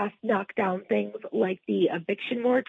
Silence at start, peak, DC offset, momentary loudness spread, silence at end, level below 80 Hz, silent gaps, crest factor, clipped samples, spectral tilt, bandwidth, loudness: 0 s; -12 dBFS; under 0.1%; 4 LU; 0 s; -78 dBFS; none; 14 dB; under 0.1%; -8.5 dB/octave; 4.1 kHz; -28 LUFS